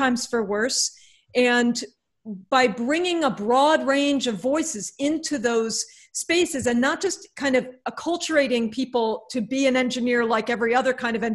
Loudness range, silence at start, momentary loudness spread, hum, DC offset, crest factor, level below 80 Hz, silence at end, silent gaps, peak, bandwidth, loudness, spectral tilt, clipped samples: 2 LU; 0 s; 8 LU; none; under 0.1%; 18 dB; -62 dBFS; 0 s; none; -6 dBFS; 12.5 kHz; -23 LUFS; -3 dB/octave; under 0.1%